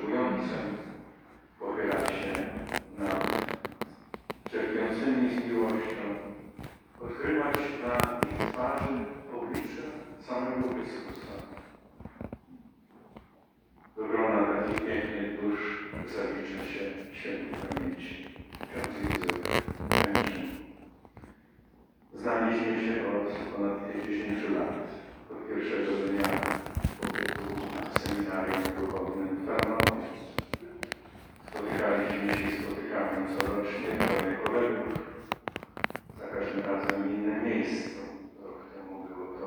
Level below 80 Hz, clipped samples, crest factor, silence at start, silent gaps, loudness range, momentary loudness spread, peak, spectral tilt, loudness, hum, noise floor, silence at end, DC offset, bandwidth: -52 dBFS; under 0.1%; 30 dB; 0 s; none; 5 LU; 16 LU; -2 dBFS; -5.5 dB/octave; -32 LUFS; none; -62 dBFS; 0 s; under 0.1%; over 20 kHz